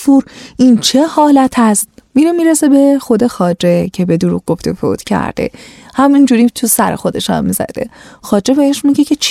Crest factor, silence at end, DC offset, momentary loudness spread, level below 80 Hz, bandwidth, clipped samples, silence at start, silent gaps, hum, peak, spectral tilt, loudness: 12 dB; 0 s; under 0.1%; 9 LU; -44 dBFS; 16 kHz; under 0.1%; 0 s; none; none; 0 dBFS; -5 dB/octave; -11 LUFS